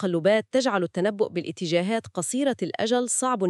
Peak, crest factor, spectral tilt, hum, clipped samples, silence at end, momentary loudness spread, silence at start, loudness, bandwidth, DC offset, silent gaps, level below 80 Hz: -8 dBFS; 16 dB; -4 dB/octave; none; under 0.1%; 0 s; 6 LU; 0 s; -25 LUFS; 13.5 kHz; under 0.1%; none; -72 dBFS